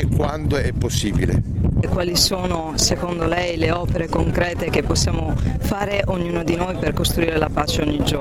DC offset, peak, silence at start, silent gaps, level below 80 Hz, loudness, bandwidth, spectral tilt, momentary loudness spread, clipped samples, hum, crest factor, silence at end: under 0.1%; -2 dBFS; 0 s; none; -28 dBFS; -20 LUFS; 17 kHz; -4.5 dB/octave; 4 LU; under 0.1%; none; 18 dB; 0 s